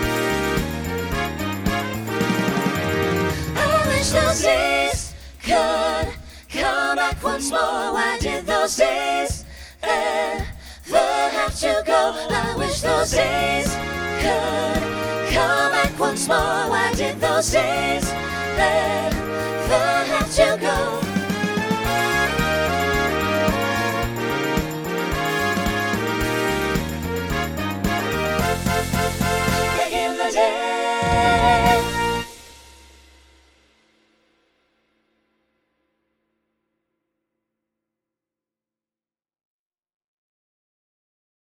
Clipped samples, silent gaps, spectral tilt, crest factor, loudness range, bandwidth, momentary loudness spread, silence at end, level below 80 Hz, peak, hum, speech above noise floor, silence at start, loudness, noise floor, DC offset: under 0.1%; none; -4 dB/octave; 20 dB; 3 LU; over 20 kHz; 7 LU; 8.8 s; -36 dBFS; -2 dBFS; none; over 70 dB; 0 s; -21 LUFS; under -90 dBFS; under 0.1%